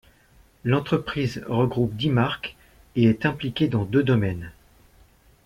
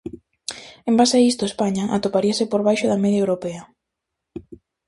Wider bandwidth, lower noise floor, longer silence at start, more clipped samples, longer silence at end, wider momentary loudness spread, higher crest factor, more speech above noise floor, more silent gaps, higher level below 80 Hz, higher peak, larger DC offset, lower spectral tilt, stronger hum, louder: first, 13.5 kHz vs 11.5 kHz; second, -56 dBFS vs -81 dBFS; first, 0.65 s vs 0.05 s; neither; first, 0.95 s vs 0.3 s; second, 11 LU vs 22 LU; about the same, 18 dB vs 18 dB; second, 34 dB vs 62 dB; neither; first, -50 dBFS vs -56 dBFS; second, -8 dBFS vs -4 dBFS; neither; first, -8 dB/octave vs -5 dB/octave; neither; second, -24 LUFS vs -19 LUFS